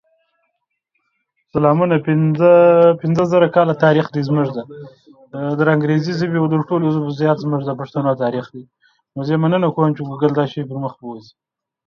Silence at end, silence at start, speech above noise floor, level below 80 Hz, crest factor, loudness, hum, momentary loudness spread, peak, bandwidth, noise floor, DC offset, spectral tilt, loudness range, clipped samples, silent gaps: 0.65 s; 1.55 s; 57 dB; -60 dBFS; 16 dB; -16 LUFS; none; 15 LU; 0 dBFS; 6.6 kHz; -73 dBFS; under 0.1%; -9 dB/octave; 6 LU; under 0.1%; none